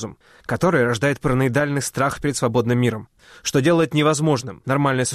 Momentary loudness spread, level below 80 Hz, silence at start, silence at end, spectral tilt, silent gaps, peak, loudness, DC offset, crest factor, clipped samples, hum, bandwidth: 8 LU; -48 dBFS; 0 s; 0 s; -5.5 dB/octave; none; -8 dBFS; -20 LUFS; under 0.1%; 12 dB; under 0.1%; none; 14 kHz